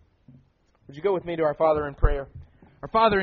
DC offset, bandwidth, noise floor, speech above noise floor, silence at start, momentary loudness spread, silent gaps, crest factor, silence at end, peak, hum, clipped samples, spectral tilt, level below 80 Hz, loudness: under 0.1%; 4.6 kHz; -62 dBFS; 39 dB; 0.9 s; 20 LU; none; 20 dB; 0 s; -6 dBFS; none; under 0.1%; -4.5 dB/octave; -32 dBFS; -25 LUFS